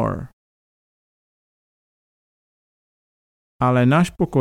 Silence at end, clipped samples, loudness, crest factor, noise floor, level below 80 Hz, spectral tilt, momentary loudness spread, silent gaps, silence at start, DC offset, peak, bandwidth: 0 s; under 0.1%; -18 LUFS; 20 dB; under -90 dBFS; -48 dBFS; -7.5 dB/octave; 10 LU; 0.33-3.59 s; 0 s; under 0.1%; -4 dBFS; 13.5 kHz